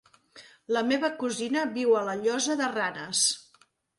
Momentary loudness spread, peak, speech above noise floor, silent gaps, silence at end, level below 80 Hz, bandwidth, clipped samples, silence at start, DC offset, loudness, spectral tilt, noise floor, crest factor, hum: 6 LU; -12 dBFS; 37 dB; none; 0.6 s; -76 dBFS; 11.5 kHz; under 0.1%; 0.35 s; under 0.1%; -27 LUFS; -2 dB/octave; -64 dBFS; 18 dB; none